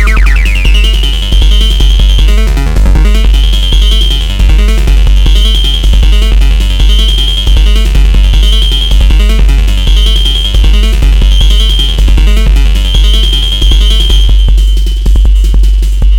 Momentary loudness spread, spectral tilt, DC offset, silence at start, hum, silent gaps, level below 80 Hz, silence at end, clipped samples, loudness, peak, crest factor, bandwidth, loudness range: 2 LU; -4.5 dB/octave; under 0.1%; 0 s; none; none; -4 dBFS; 0 s; 0.1%; -8 LUFS; 0 dBFS; 4 dB; 13.5 kHz; 0 LU